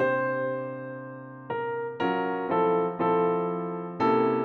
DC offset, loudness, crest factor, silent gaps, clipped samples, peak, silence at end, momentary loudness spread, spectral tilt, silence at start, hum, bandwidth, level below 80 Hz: under 0.1%; -27 LUFS; 14 dB; none; under 0.1%; -12 dBFS; 0 s; 13 LU; -8.5 dB/octave; 0 s; none; 5.4 kHz; -74 dBFS